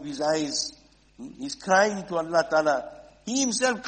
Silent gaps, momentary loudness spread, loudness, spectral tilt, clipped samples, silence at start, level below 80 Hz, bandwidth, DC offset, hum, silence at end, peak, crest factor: none; 18 LU; -25 LUFS; -2.5 dB/octave; under 0.1%; 0 s; -62 dBFS; 8.8 kHz; under 0.1%; none; 0 s; -8 dBFS; 18 dB